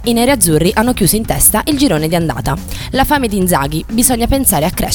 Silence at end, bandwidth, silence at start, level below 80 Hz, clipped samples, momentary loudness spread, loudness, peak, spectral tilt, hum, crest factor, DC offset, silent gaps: 0 s; 19.5 kHz; 0 s; -26 dBFS; under 0.1%; 7 LU; -12 LUFS; 0 dBFS; -4 dB/octave; none; 12 dB; under 0.1%; none